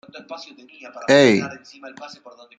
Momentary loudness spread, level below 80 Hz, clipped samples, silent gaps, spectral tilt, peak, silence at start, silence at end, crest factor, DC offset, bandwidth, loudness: 26 LU; -64 dBFS; under 0.1%; none; -5 dB/octave; 0 dBFS; 0.15 s; 0.5 s; 22 dB; under 0.1%; 9.4 kHz; -16 LUFS